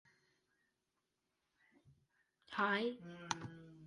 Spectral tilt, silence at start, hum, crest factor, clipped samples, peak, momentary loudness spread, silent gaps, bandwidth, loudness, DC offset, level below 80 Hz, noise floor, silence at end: -4 dB/octave; 1.85 s; none; 28 dB; under 0.1%; -18 dBFS; 14 LU; none; 11 kHz; -40 LUFS; under 0.1%; -82 dBFS; -88 dBFS; 0 s